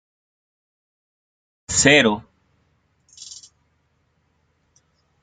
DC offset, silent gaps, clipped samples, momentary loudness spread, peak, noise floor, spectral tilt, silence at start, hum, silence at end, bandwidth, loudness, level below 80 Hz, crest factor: under 0.1%; none; under 0.1%; 28 LU; -2 dBFS; -67 dBFS; -2.5 dB/octave; 1.7 s; none; 2 s; 9.6 kHz; -16 LUFS; -54 dBFS; 24 dB